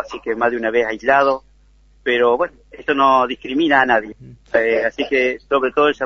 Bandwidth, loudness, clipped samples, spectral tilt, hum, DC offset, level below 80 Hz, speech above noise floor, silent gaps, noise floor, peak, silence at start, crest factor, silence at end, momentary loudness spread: 7.2 kHz; -17 LUFS; under 0.1%; -5 dB/octave; none; under 0.1%; -52 dBFS; 34 dB; none; -51 dBFS; 0 dBFS; 0 s; 18 dB; 0 s; 10 LU